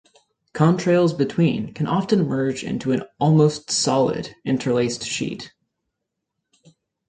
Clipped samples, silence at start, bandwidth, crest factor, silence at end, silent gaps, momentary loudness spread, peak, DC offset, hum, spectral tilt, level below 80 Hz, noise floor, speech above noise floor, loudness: under 0.1%; 0.55 s; 9.4 kHz; 18 dB; 1.6 s; none; 9 LU; -2 dBFS; under 0.1%; none; -5.5 dB/octave; -58 dBFS; -80 dBFS; 60 dB; -21 LUFS